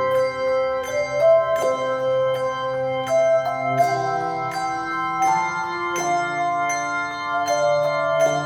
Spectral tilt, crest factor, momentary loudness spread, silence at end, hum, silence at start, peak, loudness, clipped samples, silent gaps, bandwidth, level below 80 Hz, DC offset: -4 dB/octave; 14 dB; 6 LU; 0 s; none; 0 s; -8 dBFS; -21 LUFS; under 0.1%; none; 17 kHz; -58 dBFS; under 0.1%